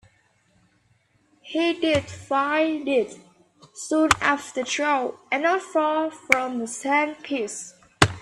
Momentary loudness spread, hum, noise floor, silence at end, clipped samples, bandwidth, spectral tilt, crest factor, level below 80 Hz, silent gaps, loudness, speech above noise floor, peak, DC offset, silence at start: 8 LU; none; -64 dBFS; 0 s; under 0.1%; 14.5 kHz; -4 dB/octave; 24 dB; -54 dBFS; none; -23 LUFS; 40 dB; 0 dBFS; under 0.1%; 1.45 s